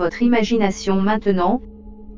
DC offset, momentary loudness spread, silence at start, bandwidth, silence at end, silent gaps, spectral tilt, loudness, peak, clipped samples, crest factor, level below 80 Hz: under 0.1%; 3 LU; 0 s; 7.6 kHz; 0 s; none; -6 dB/octave; -19 LUFS; -2 dBFS; under 0.1%; 16 dB; -40 dBFS